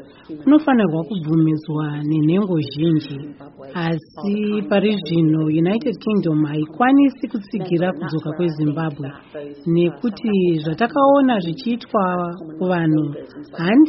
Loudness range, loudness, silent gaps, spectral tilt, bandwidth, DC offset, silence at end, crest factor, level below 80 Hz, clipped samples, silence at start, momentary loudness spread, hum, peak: 3 LU; -19 LUFS; none; -6.5 dB/octave; 5.8 kHz; under 0.1%; 0 s; 16 dB; -58 dBFS; under 0.1%; 0 s; 13 LU; none; -4 dBFS